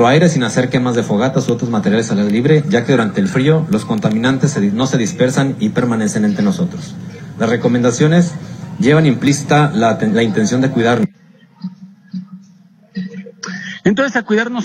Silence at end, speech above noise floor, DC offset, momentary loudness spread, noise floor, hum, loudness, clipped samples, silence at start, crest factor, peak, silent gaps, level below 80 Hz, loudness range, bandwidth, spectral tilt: 0 s; 32 dB; under 0.1%; 17 LU; -46 dBFS; none; -14 LUFS; under 0.1%; 0 s; 14 dB; 0 dBFS; none; -52 dBFS; 7 LU; 12.5 kHz; -6 dB/octave